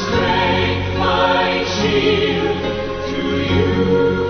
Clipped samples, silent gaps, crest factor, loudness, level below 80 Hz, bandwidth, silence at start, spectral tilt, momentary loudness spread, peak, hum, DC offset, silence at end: under 0.1%; none; 14 dB; -17 LUFS; -36 dBFS; 6.6 kHz; 0 s; -5.5 dB/octave; 6 LU; -4 dBFS; none; under 0.1%; 0 s